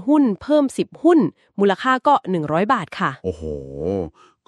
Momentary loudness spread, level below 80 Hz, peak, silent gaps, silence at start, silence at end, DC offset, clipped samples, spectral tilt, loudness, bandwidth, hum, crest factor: 11 LU; -48 dBFS; -4 dBFS; none; 0 s; 0.4 s; under 0.1%; under 0.1%; -6.5 dB/octave; -19 LUFS; 11.5 kHz; none; 16 dB